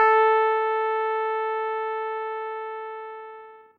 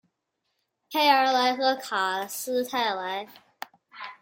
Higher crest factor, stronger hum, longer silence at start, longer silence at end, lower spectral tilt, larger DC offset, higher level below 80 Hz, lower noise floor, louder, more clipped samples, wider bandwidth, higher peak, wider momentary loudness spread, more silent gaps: about the same, 18 dB vs 20 dB; neither; second, 0 s vs 0.9 s; about the same, 0.2 s vs 0.1 s; about the same, -2.5 dB/octave vs -1.5 dB/octave; neither; about the same, -86 dBFS vs -82 dBFS; second, -45 dBFS vs -79 dBFS; about the same, -25 LUFS vs -25 LUFS; neither; second, 5 kHz vs 17 kHz; about the same, -8 dBFS vs -8 dBFS; second, 19 LU vs 22 LU; neither